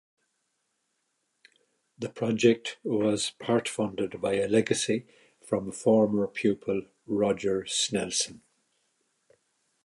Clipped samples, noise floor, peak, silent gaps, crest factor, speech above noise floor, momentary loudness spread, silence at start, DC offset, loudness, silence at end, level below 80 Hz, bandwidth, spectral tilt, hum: under 0.1%; -78 dBFS; -8 dBFS; none; 22 dB; 50 dB; 9 LU; 2 s; under 0.1%; -28 LUFS; 1.5 s; -66 dBFS; 11.5 kHz; -4 dB/octave; none